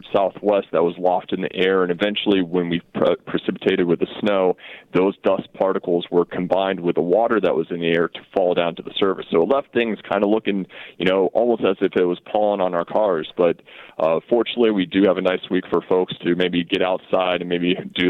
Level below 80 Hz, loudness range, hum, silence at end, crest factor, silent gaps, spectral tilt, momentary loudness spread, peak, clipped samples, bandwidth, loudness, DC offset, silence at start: -58 dBFS; 1 LU; none; 0 s; 14 dB; none; -8 dB/octave; 4 LU; -4 dBFS; under 0.1%; 5.6 kHz; -20 LUFS; under 0.1%; 0.05 s